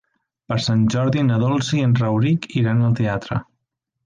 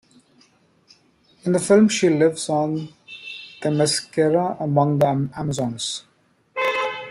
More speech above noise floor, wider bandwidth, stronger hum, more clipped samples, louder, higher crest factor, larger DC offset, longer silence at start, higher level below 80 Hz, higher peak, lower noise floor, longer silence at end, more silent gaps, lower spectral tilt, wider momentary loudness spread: first, 59 dB vs 39 dB; second, 9.2 kHz vs 12.5 kHz; neither; neither; about the same, -19 LUFS vs -20 LUFS; second, 12 dB vs 18 dB; neither; second, 0.5 s vs 1.45 s; first, -50 dBFS vs -60 dBFS; second, -8 dBFS vs -4 dBFS; first, -77 dBFS vs -58 dBFS; first, 0.65 s vs 0 s; neither; first, -7 dB/octave vs -5 dB/octave; second, 7 LU vs 16 LU